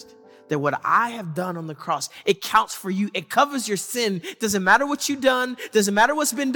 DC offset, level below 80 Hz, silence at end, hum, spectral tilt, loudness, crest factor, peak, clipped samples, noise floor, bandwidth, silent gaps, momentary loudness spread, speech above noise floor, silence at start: under 0.1%; -62 dBFS; 0 s; none; -3.5 dB/octave; -22 LUFS; 18 dB; -4 dBFS; under 0.1%; -48 dBFS; 18 kHz; none; 10 LU; 26 dB; 0 s